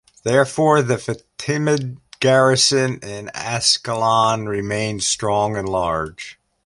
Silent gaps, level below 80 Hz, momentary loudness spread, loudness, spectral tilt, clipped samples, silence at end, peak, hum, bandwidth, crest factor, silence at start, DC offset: none; -50 dBFS; 14 LU; -18 LUFS; -3.5 dB/octave; under 0.1%; 0.35 s; -2 dBFS; none; 11.5 kHz; 18 dB; 0.25 s; under 0.1%